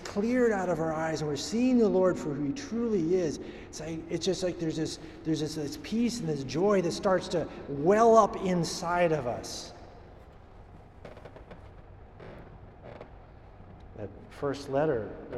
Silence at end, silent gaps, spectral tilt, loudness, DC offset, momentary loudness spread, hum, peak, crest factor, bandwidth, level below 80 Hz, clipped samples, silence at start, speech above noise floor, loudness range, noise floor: 0 s; none; -5.5 dB/octave; -29 LUFS; under 0.1%; 24 LU; none; -8 dBFS; 22 dB; 13.5 kHz; -54 dBFS; under 0.1%; 0 s; 22 dB; 23 LU; -50 dBFS